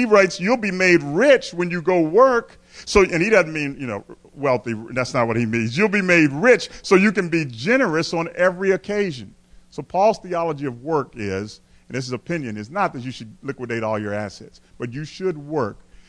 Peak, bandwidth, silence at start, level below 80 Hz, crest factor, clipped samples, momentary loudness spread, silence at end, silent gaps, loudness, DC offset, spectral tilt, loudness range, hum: -2 dBFS; 10.5 kHz; 0 s; -48 dBFS; 18 dB; under 0.1%; 15 LU; 0.35 s; none; -20 LUFS; under 0.1%; -5.5 dB/octave; 9 LU; none